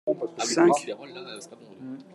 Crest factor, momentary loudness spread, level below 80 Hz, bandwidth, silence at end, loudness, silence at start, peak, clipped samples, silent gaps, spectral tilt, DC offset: 20 dB; 22 LU; -80 dBFS; 12 kHz; 0.1 s; -24 LUFS; 0.05 s; -6 dBFS; under 0.1%; none; -4 dB/octave; under 0.1%